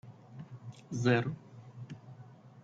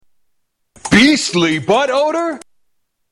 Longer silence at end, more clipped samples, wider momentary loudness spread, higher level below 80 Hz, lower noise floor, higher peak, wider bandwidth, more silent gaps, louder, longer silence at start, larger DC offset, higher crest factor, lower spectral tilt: second, 0.05 s vs 0.75 s; neither; first, 23 LU vs 14 LU; second, -72 dBFS vs -46 dBFS; second, -54 dBFS vs -68 dBFS; second, -16 dBFS vs -2 dBFS; second, 7.8 kHz vs 13 kHz; neither; second, -32 LUFS vs -14 LUFS; second, 0.05 s vs 0.85 s; neither; first, 22 dB vs 16 dB; first, -6.5 dB/octave vs -4 dB/octave